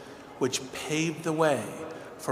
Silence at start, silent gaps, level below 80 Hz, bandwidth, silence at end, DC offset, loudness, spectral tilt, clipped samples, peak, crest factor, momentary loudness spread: 0 s; none; -68 dBFS; 16 kHz; 0 s; under 0.1%; -30 LUFS; -4 dB/octave; under 0.1%; -10 dBFS; 20 dB; 14 LU